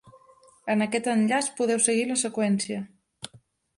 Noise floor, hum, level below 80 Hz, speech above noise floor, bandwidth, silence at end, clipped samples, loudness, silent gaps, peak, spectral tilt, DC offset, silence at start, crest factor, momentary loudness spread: -58 dBFS; none; -70 dBFS; 33 dB; 11.5 kHz; 0.4 s; under 0.1%; -25 LUFS; none; -6 dBFS; -3.5 dB/octave; under 0.1%; 0.05 s; 22 dB; 20 LU